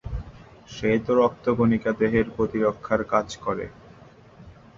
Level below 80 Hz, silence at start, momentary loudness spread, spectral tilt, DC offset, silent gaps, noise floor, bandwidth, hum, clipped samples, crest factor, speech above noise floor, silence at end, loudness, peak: -44 dBFS; 0.05 s; 15 LU; -7 dB/octave; under 0.1%; none; -49 dBFS; 7.6 kHz; none; under 0.1%; 20 dB; 26 dB; 0.25 s; -24 LUFS; -6 dBFS